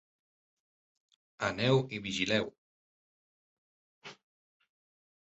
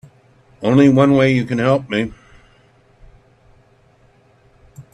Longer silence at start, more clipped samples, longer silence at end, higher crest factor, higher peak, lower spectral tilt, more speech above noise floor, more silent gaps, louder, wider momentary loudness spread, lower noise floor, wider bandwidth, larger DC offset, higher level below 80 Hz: first, 1.4 s vs 0.6 s; neither; first, 1.1 s vs 0.1 s; about the same, 22 dB vs 18 dB; second, -16 dBFS vs 0 dBFS; second, -4 dB/octave vs -7.5 dB/octave; first, over 59 dB vs 39 dB; first, 2.58-4.02 s vs none; second, -32 LUFS vs -15 LUFS; first, 23 LU vs 11 LU; first, under -90 dBFS vs -53 dBFS; second, 8 kHz vs 10 kHz; neither; second, -68 dBFS vs -50 dBFS